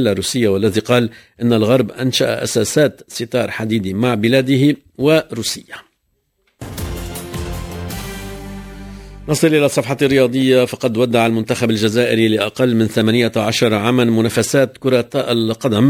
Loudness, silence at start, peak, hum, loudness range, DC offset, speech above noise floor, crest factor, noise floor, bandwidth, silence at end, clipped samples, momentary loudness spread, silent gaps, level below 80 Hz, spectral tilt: -16 LUFS; 0 s; 0 dBFS; none; 9 LU; under 0.1%; 51 dB; 16 dB; -66 dBFS; 16 kHz; 0 s; under 0.1%; 14 LU; none; -40 dBFS; -5 dB/octave